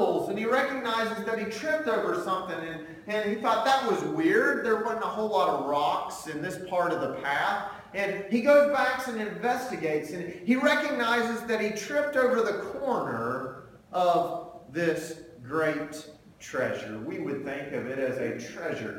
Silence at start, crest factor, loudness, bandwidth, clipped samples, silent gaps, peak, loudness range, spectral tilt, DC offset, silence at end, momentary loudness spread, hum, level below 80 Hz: 0 s; 18 dB; -28 LUFS; 17 kHz; under 0.1%; none; -10 dBFS; 6 LU; -4.5 dB/octave; under 0.1%; 0 s; 11 LU; none; -66 dBFS